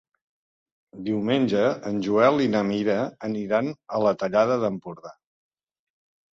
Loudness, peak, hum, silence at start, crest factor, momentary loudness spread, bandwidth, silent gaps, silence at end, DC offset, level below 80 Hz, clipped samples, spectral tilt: -23 LUFS; -6 dBFS; none; 0.95 s; 18 dB; 11 LU; 7.6 kHz; none; 1.2 s; under 0.1%; -64 dBFS; under 0.1%; -7 dB/octave